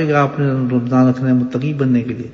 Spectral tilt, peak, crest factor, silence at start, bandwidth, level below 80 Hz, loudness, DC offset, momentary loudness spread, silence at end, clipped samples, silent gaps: -9 dB/octave; -2 dBFS; 14 dB; 0 s; 6.8 kHz; -52 dBFS; -16 LUFS; under 0.1%; 5 LU; 0 s; under 0.1%; none